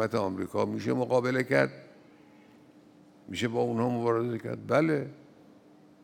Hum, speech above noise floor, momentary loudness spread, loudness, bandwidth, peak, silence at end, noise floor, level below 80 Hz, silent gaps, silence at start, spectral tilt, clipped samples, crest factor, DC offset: none; 28 dB; 8 LU; -29 LUFS; 16.5 kHz; -10 dBFS; 0.85 s; -57 dBFS; -76 dBFS; none; 0 s; -6.5 dB/octave; under 0.1%; 22 dB; under 0.1%